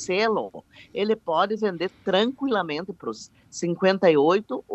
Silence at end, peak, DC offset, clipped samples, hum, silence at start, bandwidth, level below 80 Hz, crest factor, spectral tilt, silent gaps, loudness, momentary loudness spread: 0 s; -6 dBFS; under 0.1%; under 0.1%; none; 0 s; 8.4 kHz; -68 dBFS; 18 dB; -5 dB/octave; none; -24 LUFS; 16 LU